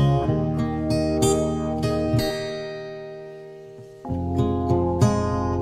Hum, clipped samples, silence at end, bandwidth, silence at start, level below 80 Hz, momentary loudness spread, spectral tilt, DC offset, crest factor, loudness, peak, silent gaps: none; under 0.1%; 0 s; 15.5 kHz; 0 s; -38 dBFS; 18 LU; -6.5 dB/octave; under 0.1%; 18 dB; -23 LUFS; -6 dBFS; none